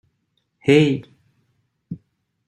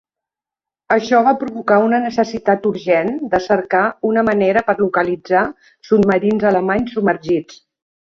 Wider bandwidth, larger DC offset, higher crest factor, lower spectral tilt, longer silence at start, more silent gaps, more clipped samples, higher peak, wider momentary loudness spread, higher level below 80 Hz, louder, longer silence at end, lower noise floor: first, 11.5 kHz vs 7.2 kHz; neither; about the same, 20 dB vs 16 dB; about the same, -7 dB/octave vs -7 dB/octave; second, 0.65 s vs 0.9 s; neither; neither; about the same, -2 dBFS vs 0 dBFS; first, 22 LU vs 5 LU; second, -62 dBFS vs -52 dBFS; about the same, -18 LUFS vs -16 LUFS; about the same, 0.5 s vs 0.6 s; second, -71 dBFS vs -88 dBFS